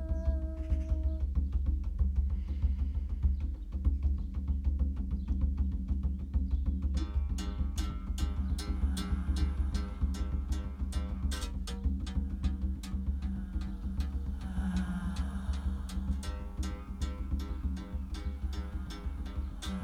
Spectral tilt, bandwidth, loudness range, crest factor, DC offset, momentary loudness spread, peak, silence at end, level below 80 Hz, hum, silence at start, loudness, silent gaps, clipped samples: -6.5 dB/octave; 11.5 kHz; 4 LU; 14 dB; under 0.1%; 6 LU; -18 dBFS; 0 s; -34 dBFS; none; 0 s; -36 LUFS; none; under 0.1%